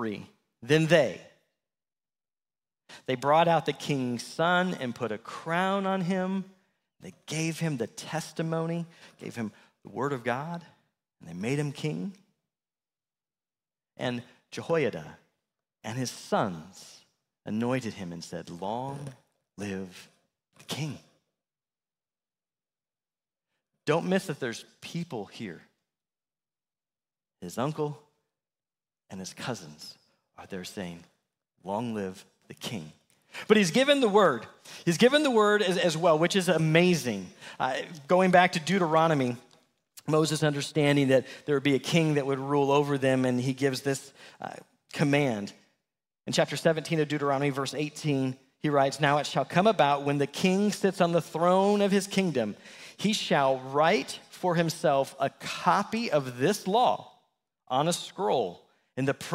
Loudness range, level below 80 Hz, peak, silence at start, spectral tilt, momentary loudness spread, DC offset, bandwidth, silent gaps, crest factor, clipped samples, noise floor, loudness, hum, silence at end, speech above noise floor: 14 LU; -72 dBFS; -6 dBFS; 0 s; -5 dB/octave; 19 LU; under 0.1%; 16 kHz; none; 24 dB; under 0.1%; under -90 dBFS; -27 LUFS; none; 0 s; over 63 dB